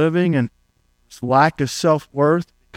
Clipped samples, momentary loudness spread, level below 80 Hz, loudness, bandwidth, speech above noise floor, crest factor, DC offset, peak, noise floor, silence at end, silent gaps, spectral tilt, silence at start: under 0.1%; 7 LU; -56 dBFS; -18 LUFS; 16 kHz; 44 dB; 18 dB; under 0.1%; -2 dBFS; -61 dBFS; 0 s; none; -6 dB/octave; 0 s